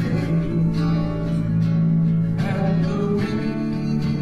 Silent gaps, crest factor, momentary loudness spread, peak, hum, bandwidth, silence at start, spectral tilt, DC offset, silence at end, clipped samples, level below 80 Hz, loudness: none; 10 dB; 4 LU; -10 dBFS; none; 6.6 kHz; 0 s; -9 dB/octave; under 0.1%; 0 s; under 0.1%; -38 dBFS; -21 LUFS